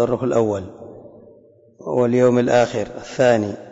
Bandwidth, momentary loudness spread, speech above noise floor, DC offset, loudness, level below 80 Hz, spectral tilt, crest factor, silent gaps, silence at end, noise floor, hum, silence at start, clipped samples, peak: 8 kHz; 20 LU; 32 dB; under 0.1%; -18 LUFS; -54 dBFS; -6.5 dB/octave; 14 dB; none; 0 s; -50 dBFS; none; 0 s; under 0.1%; -6 dBFS